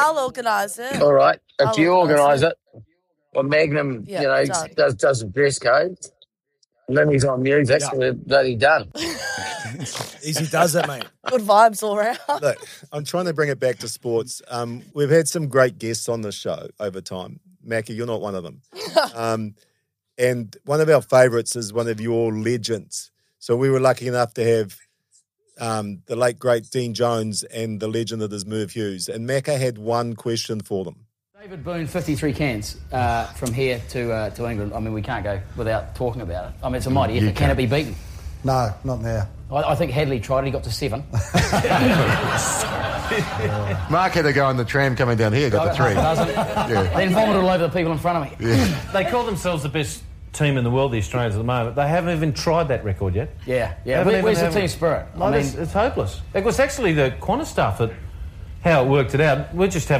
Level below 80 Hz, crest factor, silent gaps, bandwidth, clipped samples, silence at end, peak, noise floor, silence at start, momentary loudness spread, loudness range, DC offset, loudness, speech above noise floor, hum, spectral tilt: -40 dBFS; 20 dB; none; 15.5 kHz; under 0.1%; 0 s; -2 dBFS; -68 dBFS; 0 s; 12 LU; 6 LU; under 0.1%; -21 LUFS; 48 dB; none; -5 dB/octave